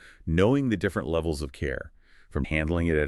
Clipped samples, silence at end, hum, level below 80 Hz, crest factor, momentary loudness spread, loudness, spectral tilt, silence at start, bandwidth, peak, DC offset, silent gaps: under 0.1%; 0 s; none; -38 dBFS; 18 dB; 12 LU; -27 LUFS; -7 dB/octave; 0.05 s; 12.5 kHz; -10 dBFS; under 0.1%; none